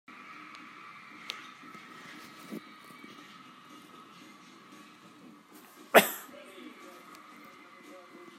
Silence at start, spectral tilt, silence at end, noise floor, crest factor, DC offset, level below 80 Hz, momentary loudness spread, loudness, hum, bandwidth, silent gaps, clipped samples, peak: 0.1 s; -2.5 dB/octave; 0 s; -54 dBFS; 34 dB; under 0.1%; -88 dBFS; 19 LU; -29 LUFS; none; 16 kHz; none; under 0.1%; -4 dBFS